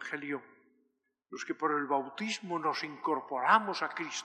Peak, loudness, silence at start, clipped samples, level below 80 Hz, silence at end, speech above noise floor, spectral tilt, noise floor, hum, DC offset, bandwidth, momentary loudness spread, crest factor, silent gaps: -10 dBFS; -32 LUFS; 0 s; under 0.1%; under -90 dBFS; 0 s; 45 dB; -3.5 dB/octave; -78 dBFS; none; under 0.1%; 11.5 kHz; 13 LU; 24 dB; none